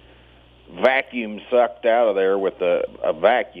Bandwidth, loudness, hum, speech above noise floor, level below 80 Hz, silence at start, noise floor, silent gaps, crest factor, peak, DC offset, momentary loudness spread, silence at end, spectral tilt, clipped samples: 5.4 kHz; -20 LUFS; none; 31 dB; -56 dBFS; 0.7 s; -50 dBFS; none; 18 dB; -2 dBFS; under 0.1%; 5 LU; 0 s; -6.5 dB/octave; under 0.1%